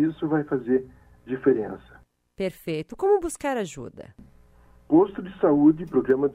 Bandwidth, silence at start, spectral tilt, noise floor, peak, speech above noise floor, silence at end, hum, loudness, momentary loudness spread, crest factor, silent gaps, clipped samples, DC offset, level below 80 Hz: 14.5 kHz; 0 s; -7 dB/octave; -54 dBFS; -8 dBFS; 31 dB; 0 s; none; -24 LUFS; 15 LU; 16 dB; none; under 0.1%; under 0.1%; -54 dBFS